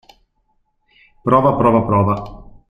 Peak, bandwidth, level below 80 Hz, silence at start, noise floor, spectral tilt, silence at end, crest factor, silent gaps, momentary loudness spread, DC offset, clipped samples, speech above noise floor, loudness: -2 dBFS; 10 kHz; -42 dBFS; 1.25 s; -64 dBFS; -10 dB/octave; 0.3 s; 16 dB; none; 12 LU; under 0.1%; under 0.1%; 50 dB; -15 LUFS